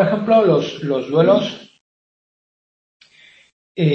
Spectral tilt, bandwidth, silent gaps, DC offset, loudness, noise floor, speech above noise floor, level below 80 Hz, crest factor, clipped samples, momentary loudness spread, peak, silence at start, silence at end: -7.5 dB/octave; 6.8 kHz; 1.81-3.00 s, 3.52-3.75 s; under 0.1%; -16 LUFS; -50 dBFS; 34 dB; -64 dBFS; 18 dB; under 0.1%; 15 LU; -2 dBFS; 0 s; 0 s